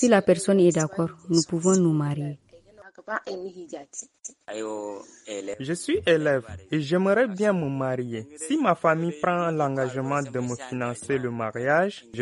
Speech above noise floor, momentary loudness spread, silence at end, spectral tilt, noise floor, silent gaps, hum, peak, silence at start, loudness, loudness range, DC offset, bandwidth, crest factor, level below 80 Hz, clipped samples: 26 dB; 16 LU; 0 s; -5.5 dB/octave; -51 dBFS; none; none; -6 dBFS; 0 s; -25 LUFS; 10 LU; under 0.1%; 11.5 kHz; 18 dB; -62 dBFS; under 0.1%